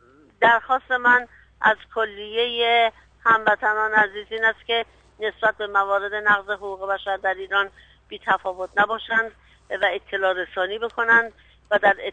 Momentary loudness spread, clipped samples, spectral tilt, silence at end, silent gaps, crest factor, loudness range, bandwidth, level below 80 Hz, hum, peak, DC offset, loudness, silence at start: 11 LU; under 0.1%; -4 dB/octave; 0 s; none; 18 dB; 4 LU; 9.2 kHz; -58 dBFS; 50 Hz at -65 dBFS; -4 dBFS; under 0.1%; -21 LUFS; 0.4 s